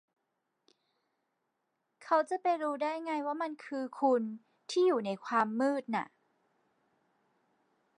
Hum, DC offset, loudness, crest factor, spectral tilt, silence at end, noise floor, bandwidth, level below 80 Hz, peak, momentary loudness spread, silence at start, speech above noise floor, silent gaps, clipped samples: none; under 0.1%; -33 LUFS; 20 dB; -5 dB/octave; 1.95 s; -83 dBFS; 11 kHz; under -90 dBFS; -16 dBFS; 10 LU; 2 s; 51 dB; none; under 0.1%